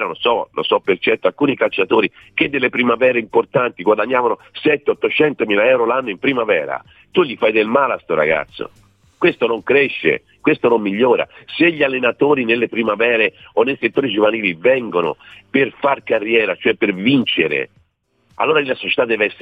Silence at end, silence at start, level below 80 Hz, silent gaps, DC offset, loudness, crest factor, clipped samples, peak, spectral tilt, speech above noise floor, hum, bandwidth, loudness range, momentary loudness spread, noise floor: 0.05 s; 0 s; -58 dBFS; none; under 0.1%; -16 LUFS; 16 dB; under 0.1%; -2 dBFS; -7.5 dB/octave; 45 dB; none; 4.9 kHz; 2 LU; 5 LU; -62 dBFS